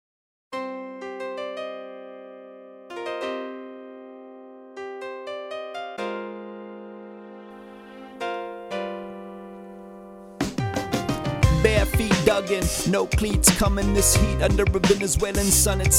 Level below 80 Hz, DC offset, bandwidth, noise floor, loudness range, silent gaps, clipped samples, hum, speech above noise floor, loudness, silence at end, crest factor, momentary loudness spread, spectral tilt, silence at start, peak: -32 dBFS; under 0.1%; 17.5 kHz; -44 dBFS; 15 LU; none; under 0.1%; none; 24 dB; -23 LUFS; 0 s; 24 dB; 24 LU; -4 dB/octave; 0.5 s; 0 dBFS